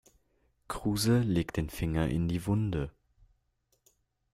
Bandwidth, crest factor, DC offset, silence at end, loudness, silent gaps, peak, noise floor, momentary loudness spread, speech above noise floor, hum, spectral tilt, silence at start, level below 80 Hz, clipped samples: 15.5 kHz; 16 dB; under 0.1%; 1.45 s; -31 LUFS; none; -16 dBFS; -75 dBFS; 9 LU; 46 dB; none; -6 dB/octave; 0.7 s; -48 dBFS; under 0.1%